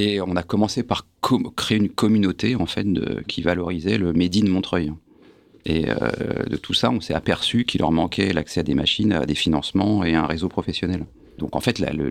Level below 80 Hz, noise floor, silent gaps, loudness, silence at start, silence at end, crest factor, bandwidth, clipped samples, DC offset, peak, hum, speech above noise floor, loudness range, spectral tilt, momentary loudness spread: -46 dBFS; -52 dBFS; none; -22 LUFS; 0 s; 0 s; 16 dB; 15 kHz; under 0.1%; under 0.1%; -6 dBFS; none; 30 dB; 2 LU; -5.5 dB/octave; 7 LU